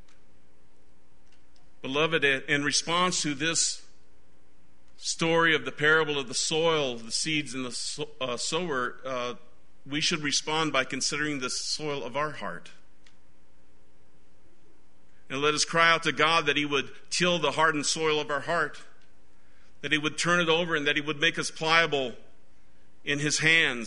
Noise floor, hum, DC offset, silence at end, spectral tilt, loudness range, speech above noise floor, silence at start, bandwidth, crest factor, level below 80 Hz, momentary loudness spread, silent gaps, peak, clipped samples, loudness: -63 dBFS; none; 1%; 0 s; -2.5 dB/octave; 7 LU; 36 dB; 1.85 s; 10.5 kHz; 24 dB; -62 dBFS; 11 LU; none; -6 dBFS; under 0.1%; -26 LUFS